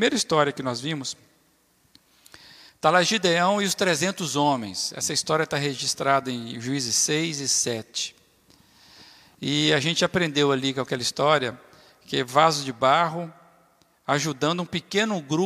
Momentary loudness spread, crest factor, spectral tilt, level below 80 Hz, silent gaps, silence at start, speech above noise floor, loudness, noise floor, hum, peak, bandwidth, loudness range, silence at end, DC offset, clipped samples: 10 LU; 22 dB; -3 dB/octave; -66 dBFS; none; 0 s; 40 dB; -23 LUFS; -63 dBFS; none; -4 dBFS; 15.5 kHz; 3 LU; 0 s; under 0.1%; under 0.1%